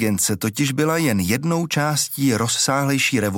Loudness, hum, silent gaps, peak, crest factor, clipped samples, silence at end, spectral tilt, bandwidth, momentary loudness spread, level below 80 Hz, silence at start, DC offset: -19 LUFS; none; none; -6 dBFS; 14 dB; under 0.1%; 0 s; -4 dB/octave; 17 kHz; 3 LU; -54 dBFS; 0 s; under 0.1%